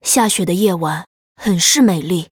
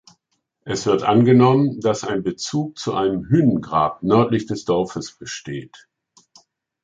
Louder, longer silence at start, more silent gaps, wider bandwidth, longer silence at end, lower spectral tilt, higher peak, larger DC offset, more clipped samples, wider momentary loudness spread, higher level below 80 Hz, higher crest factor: first, -15 LUFS vs -19 LUFS; second, 0.05 s vs 0.65 s; first, 1.07-1.35 s vs none; first, over 20 kHz vs 9.2 kHz; second, 0.05 s vs 1.1 s; second, -3.5 dB/octave vs -6.5 dB/octave; about the same, 0 dBFS vs -2 dBFS; neither; neither; second, 11 LU vs 16 LU; about the same, -52 dBFS vs -54 dBFS; about the same, 16 dB vs 18 dB